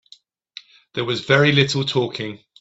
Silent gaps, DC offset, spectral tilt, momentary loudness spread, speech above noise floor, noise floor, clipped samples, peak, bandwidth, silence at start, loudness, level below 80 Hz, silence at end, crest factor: none; under 0.1%; -5 dB/octave; 19 LU; 33 dB; -52 dBFS; under 0.1%; -2 dBFS; 8 kHz; 0.95 s; -19 LUFS; -58 dBFS; 0.25 s; 20 dB